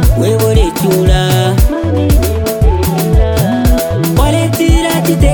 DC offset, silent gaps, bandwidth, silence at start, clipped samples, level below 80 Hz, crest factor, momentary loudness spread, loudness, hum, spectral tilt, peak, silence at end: 0.2%; none; 19.5 kHz; 0 s; under 0.1%; -14 dBFS; 10 dB; 3 LU; -11 LUFS; none; -6 dB/octave; 0 dBFS; 0 s